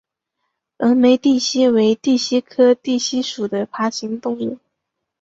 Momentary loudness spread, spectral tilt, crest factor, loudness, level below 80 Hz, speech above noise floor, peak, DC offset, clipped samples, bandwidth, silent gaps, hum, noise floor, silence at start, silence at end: 11 LU; -4 dB/octave; 16 dB; -17 LUFS; -62 dBFS; 61 dB; -2 dBFS; under 0.1%; under 0.1%; 7.8 kHz; none; none; -78 dBFS; 0.8 s; 0.65 s